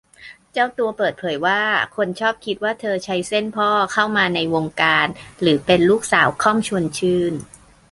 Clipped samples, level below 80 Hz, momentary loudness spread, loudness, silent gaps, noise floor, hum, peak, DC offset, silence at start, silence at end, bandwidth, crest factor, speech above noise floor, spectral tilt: under 0.1%; -54 dBFS; 7 LU; -19 LUFS; none; -44 dBFS; none; -2 dBFS; under 0.1%; 0.2 s; 0.45 s; 11.5 kHz; 18 dB; 25 dB; -4.5 dB/octave